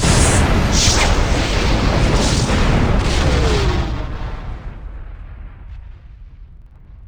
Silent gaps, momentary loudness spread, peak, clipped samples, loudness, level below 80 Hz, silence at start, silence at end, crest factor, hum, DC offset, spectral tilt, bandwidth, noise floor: none; 23 LU; 0 dBFS; under 0.1%; -16 LUFS; -20 dBFS; 0 s; 0 s; 16 dB; none; under 0.1%; -4.5 dB/octave; over 20 kHz; -39 dBFS